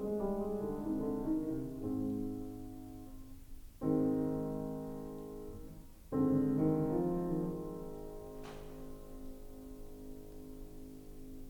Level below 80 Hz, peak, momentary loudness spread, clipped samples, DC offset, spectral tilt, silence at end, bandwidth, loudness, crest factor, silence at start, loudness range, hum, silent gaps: -52 dBFS; -20 dBFS; 19 LU; under 0.1%; under 0.1%; -9 dB/octave; 0 s; 19 kHz; -37 LUFS; 18 dB; 0 s; 13 LU; none; none